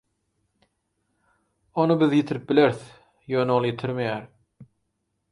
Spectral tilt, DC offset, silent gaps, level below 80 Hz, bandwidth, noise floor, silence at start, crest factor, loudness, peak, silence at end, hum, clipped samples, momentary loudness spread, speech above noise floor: -7.5 dB/octave; under 0.1%; none; -66 dBFS; 11 kHz; -76 dBFS; 1.75 s; 20 dB; -23 LUFS; -6 dBFS; 0.65 s; none; under 0.1%; 11 LU; 54 dB